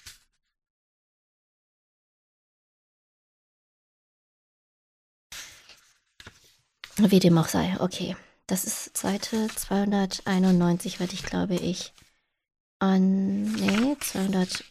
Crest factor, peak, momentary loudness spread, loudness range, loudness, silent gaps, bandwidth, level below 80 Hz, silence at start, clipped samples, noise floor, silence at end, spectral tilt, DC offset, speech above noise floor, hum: 20 dB; -8 dBFS; 14 LU; 2 LU; -25 LUFS; 0.70-5.30 s, 12.60-12.80 s; 15.5 kHz; -56 dBFS; 0.05 s; under 0.1%; -61 dBFS; 0.05 s; -5.5 dB/octave; under 0.1%; 37 dB; none